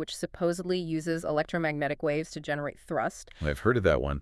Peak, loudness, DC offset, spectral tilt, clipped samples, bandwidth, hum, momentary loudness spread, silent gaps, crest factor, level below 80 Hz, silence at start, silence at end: -10 dBFS; -30 LUFS; under 0.1%; -6 dB/octave; under 0.1%; 12 kHz; none; 8 LU; none; 20 dB; -46 dBFS; 0 s; 0 s